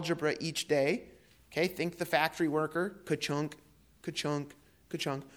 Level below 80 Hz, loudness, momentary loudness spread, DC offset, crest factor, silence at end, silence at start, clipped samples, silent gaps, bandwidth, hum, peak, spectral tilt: -68 dBFS; -33 LUFS; 10 LU; under 0.1%; 22 dB; 0 s; 0 s; under 0.1%; none; 19.5 kHz; none; -12 dBFS; -4.5 dB/octave